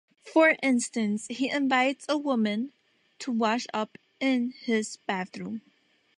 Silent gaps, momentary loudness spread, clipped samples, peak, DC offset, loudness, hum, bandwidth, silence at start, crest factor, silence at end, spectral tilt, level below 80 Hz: none; 15 LU; under 0.1%; -8 dBFS; under 0.1%; -27 LUFS; none; 11 kHz; 0.25 s; 20 dB; 0.6 s; -4 dB/octave; -80 dBFS